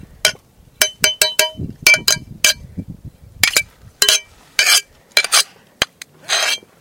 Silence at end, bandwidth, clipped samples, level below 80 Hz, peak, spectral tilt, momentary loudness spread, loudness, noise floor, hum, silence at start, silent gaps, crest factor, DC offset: 0.2 s; over 20 kHz; under 0.1%; -46 dBFS; 0 dBFS; 0.5 dB/octave; 10 LU; -15 LUFS; -43 dBFS; none; 0.25 s; none; 18 dB; under 0.1%